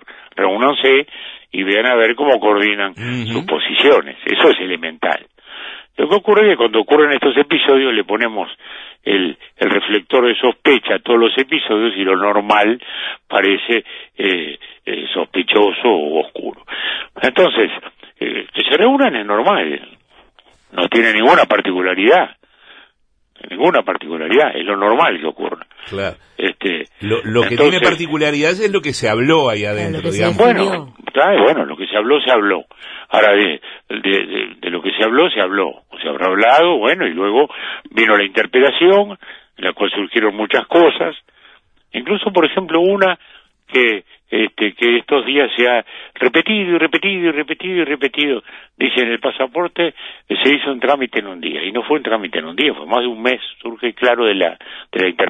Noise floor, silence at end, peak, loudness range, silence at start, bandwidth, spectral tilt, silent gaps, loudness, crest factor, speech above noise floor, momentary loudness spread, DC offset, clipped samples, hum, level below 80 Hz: -59 dBFS; 0 s; 0 dBFS; 3 LU; 0.1 s; 10.5 kHz; -5 dB/octave; none; -15 LUFS; 16 dB; 44 dB; 12 LU; under 0.1%; under 0.1%; none; -58 dBFS